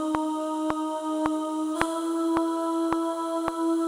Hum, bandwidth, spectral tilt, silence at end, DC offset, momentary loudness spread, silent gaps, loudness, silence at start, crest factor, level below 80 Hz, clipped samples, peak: none; 13.5 kHz; -4.5 dB/octave; 0 s; under 0.1%; 3 LU; none; -27 LUFS; 0 s; 26 dB; -56 dBFS; under 0.1%; -2 dBFS